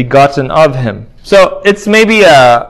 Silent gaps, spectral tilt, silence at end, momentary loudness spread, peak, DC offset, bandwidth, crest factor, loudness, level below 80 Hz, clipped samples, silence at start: none; -5 dB/octave; 0 s; 12 LU; 0 dBFS; under 0.1%; 16 kHz; 6 dB; -7 LUFS; -38 dBFS; 5%; 0 s